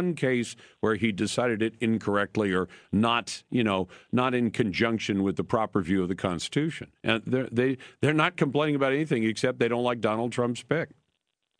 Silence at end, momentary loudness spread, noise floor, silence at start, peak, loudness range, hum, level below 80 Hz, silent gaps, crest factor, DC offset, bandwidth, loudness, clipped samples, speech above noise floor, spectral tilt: 0.75 s; 5 LU; -79 dBFS; 0 s; -8 dBFS; 1 LU; none; -60 dBFS; none; 18 dB; under 0.1%; 10.5 kHz; -27 LUFS; under 0.1%; 52 dB; -5.5 dB/octave